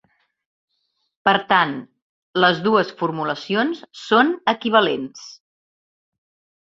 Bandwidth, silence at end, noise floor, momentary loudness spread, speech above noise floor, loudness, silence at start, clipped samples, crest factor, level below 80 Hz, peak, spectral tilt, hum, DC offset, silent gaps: 7.8 kHz; 1.3 s; -72 dBFS; 15 LU; 53 dB; -19 LUFS; 1.25 s; under 0.1%; 22 dB; -64 dBFS; 0 dBFS; -5 dB/octave; none; under 0.1%; 2.02-2.33 s